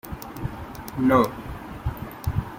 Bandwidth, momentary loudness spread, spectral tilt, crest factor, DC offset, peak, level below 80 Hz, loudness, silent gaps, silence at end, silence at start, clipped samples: 16.5 kHz; 17 LU; -7.5 dB/octave; 22 dB; under 0.1%; -4 dBFS; -40 dBFS; -26 LUFS; none; 0 s; 0.05 s; under 0.1%